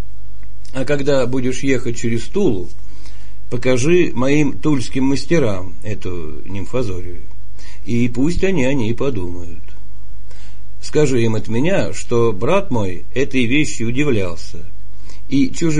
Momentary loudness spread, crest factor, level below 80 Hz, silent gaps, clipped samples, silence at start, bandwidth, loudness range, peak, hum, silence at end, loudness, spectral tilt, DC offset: 18 LU; 18 dB; -36 dBFS; none; under 0.1%; 0 s; 10.5 kHz; 3 LU; 0 dBFS; 50 Hz at -40 dBFS; 0 s; -19 LUFS; -6 dB/octave; 20%